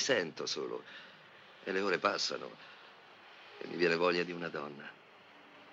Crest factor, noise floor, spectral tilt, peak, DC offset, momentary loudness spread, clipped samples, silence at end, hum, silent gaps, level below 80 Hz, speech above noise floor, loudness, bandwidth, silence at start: 22 dB; -58 dBFS; -3 dB/octave; -14 dBFS; under 0.1%; 24 LU; under 0.1%; 0 s; none; none; -84 dBFS; 23 dB; -35 LUFS; 8 kHz; 0 s